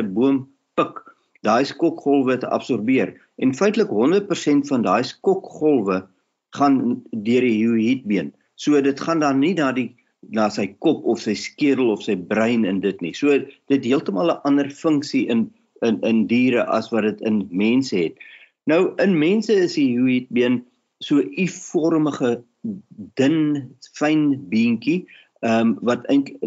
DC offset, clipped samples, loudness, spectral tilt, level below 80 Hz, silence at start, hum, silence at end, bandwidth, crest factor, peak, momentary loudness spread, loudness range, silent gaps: under 0.1%; under 0.1%; -20 LUFS; -6 dB/octave; -72 dBFS; 0 s; none; 0 s; 8 kHz; 14 dB; -6 dBFS; 8 LU; 2 LU; none